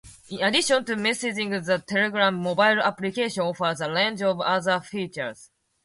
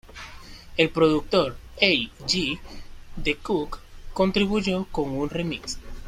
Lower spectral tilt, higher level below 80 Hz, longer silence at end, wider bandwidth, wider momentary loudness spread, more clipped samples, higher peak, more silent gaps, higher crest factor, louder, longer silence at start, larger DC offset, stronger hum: about the same, -3.5 dB/octave vs -4.5 dB/octave; second, -66 dBFS vs -42 dBFS; first, 0.4 s vs 0 s; second, 11.5 kHz vs 15 kHz; second, 9 LU vs 21 LU; neither; second, -8 dBFS vs -4 dBFS; neither; about the same, 18 dB vs 22 dB; about the same, -24 LUFS vs -24 LUFS; about the same, 0.05 s vs 0.05 s; neither; neither